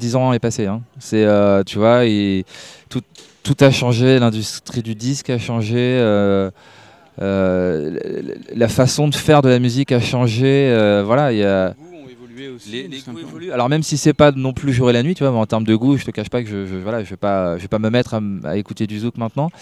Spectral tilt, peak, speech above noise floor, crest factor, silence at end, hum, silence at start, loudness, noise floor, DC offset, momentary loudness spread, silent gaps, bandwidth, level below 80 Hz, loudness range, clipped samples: -6 dB/octave; 0 dBFS; 22 dB; 16 dB; 0.1 s; none; 0 s; -17 LUFS; -38 dBFS; under 0.1%; 15 LU; none; 13.5 kHz; -48 dBFS; 4 LU; under 0.1%